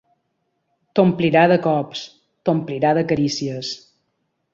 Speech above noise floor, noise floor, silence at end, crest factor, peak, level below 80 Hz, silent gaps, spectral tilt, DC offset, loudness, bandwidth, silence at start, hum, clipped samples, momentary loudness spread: 54 dB; -72 dBFS; 0.75 s; 18 dB; -2 dBFS; -58 dBFS; none; -6 dB/octave; under 0.1%; -19 LUFS; 7.8 kHz; 0.95 s; none; under 0.1%; 15 LU